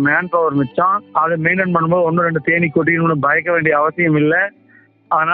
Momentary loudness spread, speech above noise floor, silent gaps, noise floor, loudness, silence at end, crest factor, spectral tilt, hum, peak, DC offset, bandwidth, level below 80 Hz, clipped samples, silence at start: 3 LU; 35 dB; none; -50 dBFS; -15 LUFS; 0 s; 16 dB; -6 dB/octave; none; 0 dBFS; under 0.1%; 4.2 kHz; -56 dBFS; under 0.1%; 0 s